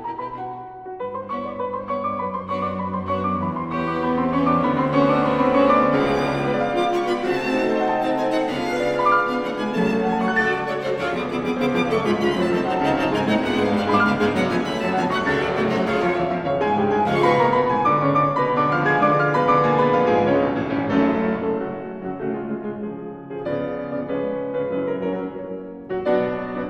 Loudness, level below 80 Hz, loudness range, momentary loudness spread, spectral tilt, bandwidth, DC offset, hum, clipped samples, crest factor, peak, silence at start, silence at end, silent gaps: -21 LUFS; -52 dBFS; 8 LU; 11 LU; -7 dB/octave; 12.5 kHz; under 0.1%; none; under 0.1%; 16 dB; -6 dBFS; 0 s; 0 s; none